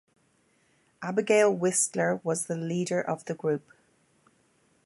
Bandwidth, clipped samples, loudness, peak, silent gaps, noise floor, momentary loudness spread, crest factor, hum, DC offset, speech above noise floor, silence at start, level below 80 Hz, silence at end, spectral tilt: 12 kHz; under 0.1%; -27 LUFS; -10 dBFS; none; -68 dBFS; 9 LU; 18 dB; none; under 0.1%; 41 dB; 1 s; -78 dBFS; 1.25 s; -4.5 dB/octave